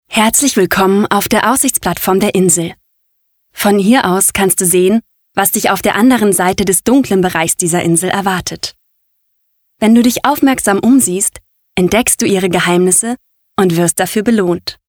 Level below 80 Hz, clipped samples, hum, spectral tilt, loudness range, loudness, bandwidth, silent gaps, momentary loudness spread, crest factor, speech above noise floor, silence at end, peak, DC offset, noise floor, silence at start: -42 dBFS; under 0.1%; none; -4 dB/octave; 3 LU; -11 LUFS; over 20 kHz; none; 7 LU; 12 dB; 51 dB; 0.15 s; 0 dBFS; under 0.1%; -63 dBFS; 0.1 s